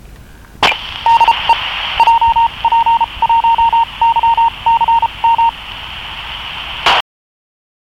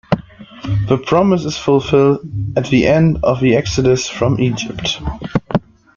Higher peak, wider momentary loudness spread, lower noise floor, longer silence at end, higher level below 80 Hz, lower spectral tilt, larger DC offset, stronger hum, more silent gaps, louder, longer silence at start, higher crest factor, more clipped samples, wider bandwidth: about the same, -2 dBFS vs -2 dBFS; first, 13 LU vs 9 LU; about the same, -36 dBFS vs -34 dBFS; first, 0.95 s vs 0.4 s; about the same, -38 dBFS vs -36 dBFS; second, -2 dB/octave vs -6 dB/octave; neither; neither; neither; first, -12 LUFS vs -15 LUFS; about the same, 0.05 s vs 0.1 s; about the same, 10 dB vs 14 dB; neither; first, 13.5 kHz vs 7.6 kHz